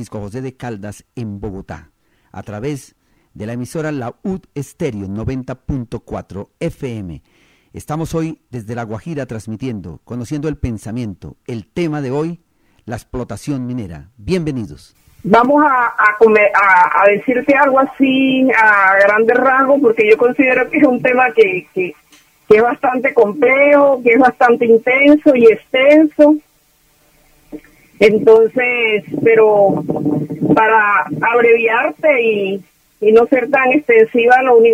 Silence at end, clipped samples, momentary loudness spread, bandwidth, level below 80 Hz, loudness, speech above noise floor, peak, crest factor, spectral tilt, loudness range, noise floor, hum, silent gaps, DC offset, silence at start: 0 s; under 0.1%; 18 LU; 12 kHz; -44 dBFS; -12 LUFS; 42 dB; 0 dBFS; 14 dB; -6.5 dB/octave; 14 LU; -55 dBFS; none; none; under 0.1%; 0 s